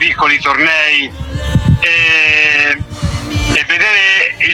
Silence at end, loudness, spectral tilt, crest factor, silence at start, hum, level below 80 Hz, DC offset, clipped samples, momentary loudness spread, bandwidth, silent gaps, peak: 0 s; -10 LUFS; -4 dB/octave; 12 dB; 0 s; none; -26 dBFS; under 0.1%; under 0.1%; 10 LU; 16.5 kHz; none; 0 dBFS